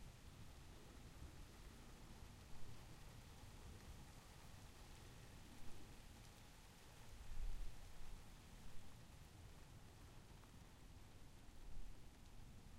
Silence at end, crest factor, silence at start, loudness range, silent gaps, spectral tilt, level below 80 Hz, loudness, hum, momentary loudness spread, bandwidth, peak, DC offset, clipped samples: 0 s; 18 dB; 0 s; 3 LU; none; -4.5 dB/octave; -58 dBFS; -62 LUFS; none; 4 LU; 16 kHz; -36 dBFS; under 0.1%; under 0.1%